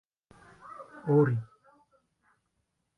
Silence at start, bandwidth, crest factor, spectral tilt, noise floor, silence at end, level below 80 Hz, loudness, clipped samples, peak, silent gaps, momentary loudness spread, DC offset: 0.7 s; 3.8 kHz; 20 dB; -11 dB/octave; -79 dBFS; 1.55 s; -72 dBFS; -28 LUFS; under 0.1%; -14 dBFS; none; 24 LU; under 0.1%